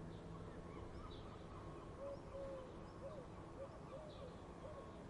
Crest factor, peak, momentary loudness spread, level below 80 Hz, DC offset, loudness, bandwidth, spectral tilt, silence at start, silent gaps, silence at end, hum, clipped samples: 14 dB; -38 dBFS; 3 LU; -62 dBFS; under 0.1%; -54 LUFS; 11 kHz; -7 dB/octave; 0 s; none; 0 s; none; under 0.1%